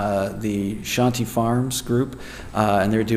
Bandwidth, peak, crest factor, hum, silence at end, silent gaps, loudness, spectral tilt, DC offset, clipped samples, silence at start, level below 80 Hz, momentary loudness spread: 15.5 kHz; -4 dBFS; 18 dB; none; 0 s; none; -22 LUFS; -5.5 dB/octave; under 0.1%; under 0.1%; 0 s; -44 dBFS; 7 LU